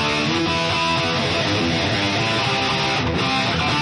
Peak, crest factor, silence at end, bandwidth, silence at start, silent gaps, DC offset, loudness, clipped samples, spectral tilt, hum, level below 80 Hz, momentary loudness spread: -6 dBFS; 12 dB; 0 s; 10.5 kHz; 0 s; none; under 0.1%; -19 LUFS; under 0.1%; -4 dB/octave; none; -42 dBFS; 1 LU